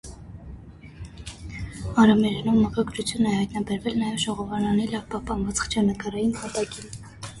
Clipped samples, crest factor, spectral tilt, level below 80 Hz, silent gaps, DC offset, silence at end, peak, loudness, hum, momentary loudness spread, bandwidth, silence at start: under 0.1%; 18 dB; -5 dB/octave; -44 dBFS; none; under 0.1%; 0 s; -6 dBFS; -24 LUFS; none; 22 LU; 11.5 kHz; 0.05 s